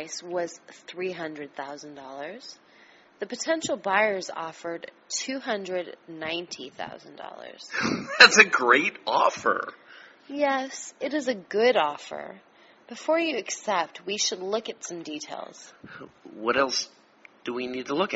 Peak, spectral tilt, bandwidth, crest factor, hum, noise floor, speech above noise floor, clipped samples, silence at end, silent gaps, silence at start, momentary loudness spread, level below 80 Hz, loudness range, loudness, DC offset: 0 dBFS; 0 dB/octave; 8 kHz; 28 dB; none; -56 dBFS; 29 dB; under 0.1%; 0 s; none; 0 s; 20 LU; -72 dBFS; 13 LU; -25 LUFS; under 0.1%